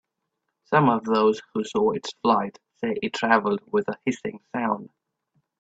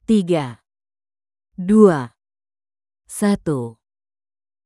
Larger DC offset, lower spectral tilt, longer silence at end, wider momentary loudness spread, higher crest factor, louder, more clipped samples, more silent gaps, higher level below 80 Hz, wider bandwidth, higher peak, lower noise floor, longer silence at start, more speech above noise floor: neither; about the same, -6 dB/octave vs -7 dB/octave; second, 0.75 s vs 0.95 s; second, 10 LU vs 19 LU; about the same, 20 dB vs 20 dB; second, -24 LUFS vs -18 LUFS; neither; neither; second, -66 dBFS vs -54 dBFS; second, 8 kHz vs 12 kHz; second, -4 dBFS vs 0 dBFS; second, -80 dBFS vs under -90 dBFS; first, 0.7 s vs 0.1 s; second, 56 dB vs over 74 dB